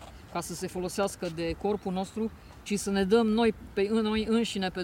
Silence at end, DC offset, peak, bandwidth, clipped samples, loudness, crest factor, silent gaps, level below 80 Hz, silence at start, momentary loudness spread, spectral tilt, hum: 0 s; under 0.1%; -12 dBFS; 17 kHz; under 0.1%; -29 LUFS; 18 dB; none; -50 dBFS; 0 s; 11 LU; -5 dB/octave; none